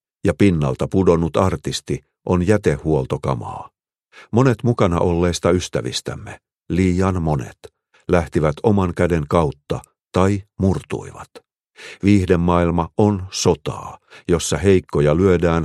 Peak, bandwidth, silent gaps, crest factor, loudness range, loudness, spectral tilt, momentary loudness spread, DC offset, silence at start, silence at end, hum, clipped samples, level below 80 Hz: 0 dBFS; 13 kHz; none; 18 dB; 3 LU; -19 LUFS; -6.5 dB/octave; 13 LU; under 0.1%; 0.25 s; 0 s; none; under 0.1%; -38 dBFS